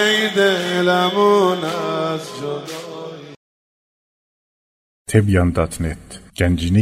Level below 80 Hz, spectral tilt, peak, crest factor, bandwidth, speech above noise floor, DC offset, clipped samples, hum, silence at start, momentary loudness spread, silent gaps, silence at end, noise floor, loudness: -38 dBFS; -5.5 dB/octave; -2 dBFS; 18 dB; 16 kHz; over 73 dB; under 0.1%; under 0.1%; none; 0 s; 18 LU; 3.36-5.05 s; 0 s; under -90 dBFS; -18 LUFS